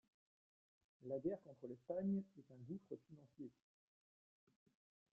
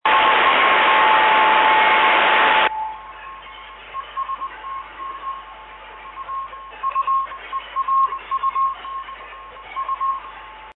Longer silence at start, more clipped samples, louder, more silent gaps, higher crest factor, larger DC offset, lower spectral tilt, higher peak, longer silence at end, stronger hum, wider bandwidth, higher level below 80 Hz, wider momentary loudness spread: first, 1 s vs 0.05 s; neither; second, -49 LUFS vs -17 LUFS; neither; about the same, 18 dB vs 14 dB; neither; first, -11.5 dB/octave vs -6 dB/octave; second, -32 dBFS vs -4 dBFS; first, 1.65 s vs 0.05 s; neither; second, 2.8 kHz vs 4.4 kHz; second, -88 dBFS vs -54 dBFS; second, 17 LU vs 23 LU